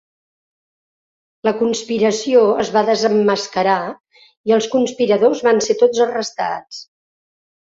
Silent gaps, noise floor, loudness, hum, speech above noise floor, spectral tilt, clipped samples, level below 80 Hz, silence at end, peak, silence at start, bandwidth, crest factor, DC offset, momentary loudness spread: 4.00-4.04 s, 4.37-4.44 s; under -90 dBFS; -16 LUFS; none; over 74 dB; -4 dB/octave; under 0.1%; -62 dBFS; 0.95 s; -2 dBFS; 1.45 s; 7.8 kHz; 16 dB; under 0.1%; 9 LU